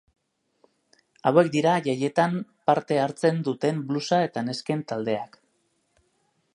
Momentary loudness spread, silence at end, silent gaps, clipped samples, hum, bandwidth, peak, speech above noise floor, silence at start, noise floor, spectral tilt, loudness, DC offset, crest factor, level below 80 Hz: 8 LU; 1.3 s; none; under 0.1%; none; 11.5 kHz; -4 dBFS; 47 dB; 1.25 s; -71 dBFS; -6 dB/octave; -25 LUFS; under 0.1%; 22 dB; -72 dBFS